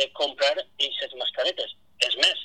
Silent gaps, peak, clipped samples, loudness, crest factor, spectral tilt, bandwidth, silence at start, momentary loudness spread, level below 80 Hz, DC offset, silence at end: none; -4 dBFS; under 0.1%; -25 LUFS; 22 dB; 1 dB/octave; 12.5 kHz; 0 s; 8 LU; -74 dBFS; 0.2%; 0 s